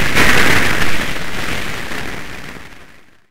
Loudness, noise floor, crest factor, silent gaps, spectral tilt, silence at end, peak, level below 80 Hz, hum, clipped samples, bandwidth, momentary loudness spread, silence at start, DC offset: -16 LUFS; -44 dBFS; 12 dB; none; -3 dB/octave; 0 s; 0 dBFS; -32 dBFS; none; under 0.1%; 16.5 kHz; 19 LU; 0 s; under 0.1%